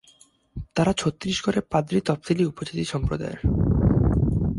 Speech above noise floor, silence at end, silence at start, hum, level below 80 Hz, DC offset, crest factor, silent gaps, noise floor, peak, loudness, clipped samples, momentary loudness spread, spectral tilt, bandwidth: 33 dB; 0 s; 0.55 s; none; -32 dBFS; under 0.1%; 16 dB; none; -57 dBFS; -6 dBFS; -24 LUFS; under 0.1%; 8 LU; -6.5 dB/octave; 11.5 kHz